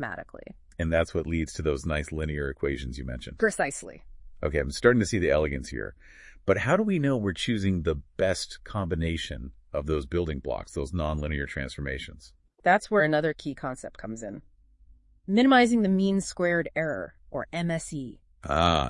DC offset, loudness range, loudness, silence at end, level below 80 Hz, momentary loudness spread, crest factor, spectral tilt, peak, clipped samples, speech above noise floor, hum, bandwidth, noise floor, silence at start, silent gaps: under 0.1%; 5 LU; -27 LUFS; 0 s; -44 dBFS; 15 LU; 22 dB; -5.5 dB/octave; -6 dBFS; under 0.1%; 30 dB; none; 11 kHz; -57 dBFS; 0 s; none